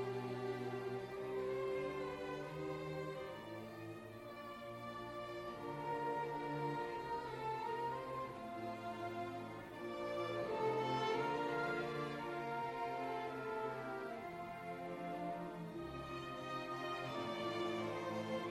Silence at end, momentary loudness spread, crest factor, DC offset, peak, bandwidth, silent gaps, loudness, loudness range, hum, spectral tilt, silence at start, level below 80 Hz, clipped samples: 0 s; 9 LU; 16 dB; under 0.1%; -28 dBFS; 16 kHz; none; -44 LUFS; 6 LU; none; -6 dB/octave; 0 s; -70 dBFS; under 0.1%